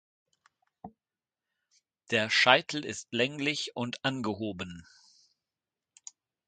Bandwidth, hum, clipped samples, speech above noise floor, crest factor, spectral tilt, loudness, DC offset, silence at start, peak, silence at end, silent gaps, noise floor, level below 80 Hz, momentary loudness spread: 9.6 kHz; none; under 0.1%; over 60 dB; 30 dB; -3.5 dB/octave; -28 LUFS; under 0.1%; 0.85 s; -4 dBFS; 1.65 s; none; under -90 dBFS; -68 dBFS; 27 LU